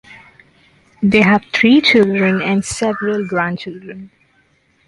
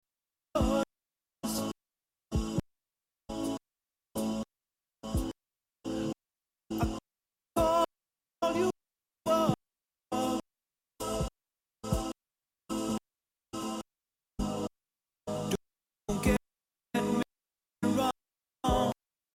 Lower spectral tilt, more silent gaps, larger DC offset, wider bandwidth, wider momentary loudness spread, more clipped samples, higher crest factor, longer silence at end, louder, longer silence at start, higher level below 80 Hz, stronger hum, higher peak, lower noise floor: about the same, -5 dB/octave vs -5.5 dB/octave; neither; neither; second, 11.5 kHz vs 16 kHz; first, 19 LU vs 15 LU; neither; second, 16 dB vs 22 dB; first, 0.8 s vs 0.4 s; first, -14 LUFS vs -34 LUFS; second, 0.1 s vs 0.55 s; about the same, -50 dBFS vs -46 dBFS; neither; first, 0 dBFS vs -14 dBFS; second, -57 dBFS vs under -90 dBFS